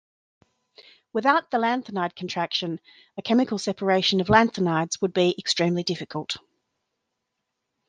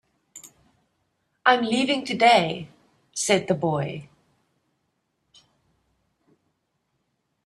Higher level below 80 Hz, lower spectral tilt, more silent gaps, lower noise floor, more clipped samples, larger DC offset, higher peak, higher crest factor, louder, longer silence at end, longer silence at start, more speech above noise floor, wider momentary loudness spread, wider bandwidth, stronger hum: first, -58 dBFS vs -68 dBFS; about the same, -4.5 dB/octave vs -3.5 dB/octave; neither; first, -81 dBFS vs -75 dBFS; neither; neither; about the same, -4 dBFS vs -4 dBFS; about the same, 22 dB vs 24 dB; about the same, -24 LUFS vs -22 LUFS; second, 1.5 s vs 3.4 s; first, 1.15 s vs 0.35 s; first, 57 dB vs 53 dB; second, 13 LU vs 27 LU; second, 9.8 kHz vs 13.5 kHz; neither